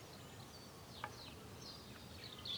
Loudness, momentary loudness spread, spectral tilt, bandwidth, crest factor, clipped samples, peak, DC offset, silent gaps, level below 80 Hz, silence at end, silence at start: -52 LUFS; 5 LU; -3.5 dB/octave; over 20 kHz; 24 dB; under 0.1%; -28 dBFS; under 0.1%; none; -70 dBFS; 0 s; 0 s